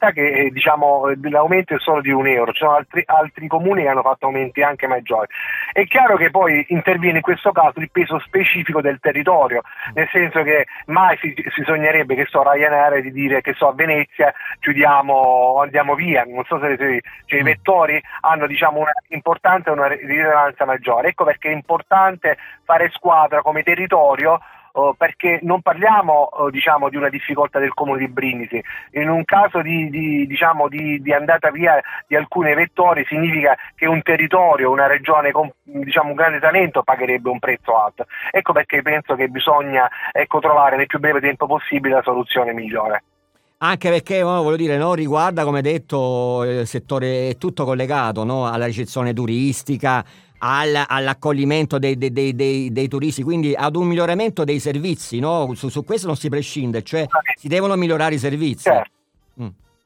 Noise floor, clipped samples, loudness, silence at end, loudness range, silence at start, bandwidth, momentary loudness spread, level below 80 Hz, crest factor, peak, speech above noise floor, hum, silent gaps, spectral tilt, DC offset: -63 dBFS; under 0.1%; -17 LUFS; 0.35 s; 5 LU; 0 s; 18 kHz; 8 LU; -62 dBFS; 16 dB; -2 dBFS; 46 dB; none; none; -6 dB/octave; under 0.1%